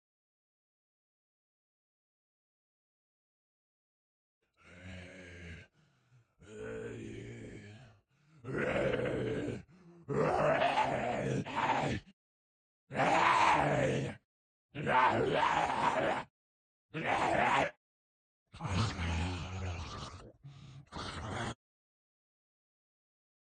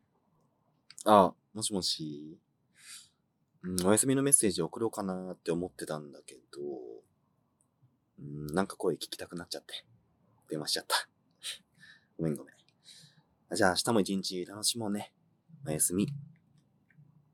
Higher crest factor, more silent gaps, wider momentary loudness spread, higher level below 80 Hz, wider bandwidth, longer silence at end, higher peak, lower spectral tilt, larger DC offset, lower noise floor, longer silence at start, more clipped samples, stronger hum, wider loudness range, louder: second, 22 dB vs 28 dB; first, 12.13-12.87 s, 14.25-14.69 s, 16.30-16.89 s, 17.77-18.46 s vs none; about the same, 22 LU vs 22 LU; first, -60 dBFS vs -72 dBFS; second, 9.4 kHz vs 18 kHz; first, 1.95 s vs 1.1 s; second, -14 dBFS vs -6 dBFS; first, -5.5 dB/octave vs -3.5 dB/octave; neither; second, -69 dBFS vs -75 dBFS; first, 4.65 s vs 1.05 s; neither; neither; first, 18 LU vs 9 LU; about the same, -33 LUFS vs -31 LUFS